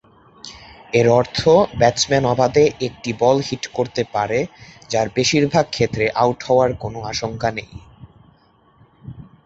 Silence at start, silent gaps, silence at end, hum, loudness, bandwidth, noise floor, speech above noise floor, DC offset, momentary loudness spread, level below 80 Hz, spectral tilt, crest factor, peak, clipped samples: 0.45 s; none; 0.25 s; none; -18 LUFS; 8 kHz; -55 dBFS; 37 dB; under 0.1%; 14 LU; -46 dBFS; -5 dB/octave; 18 dB; -2 dBFS; under 0.1%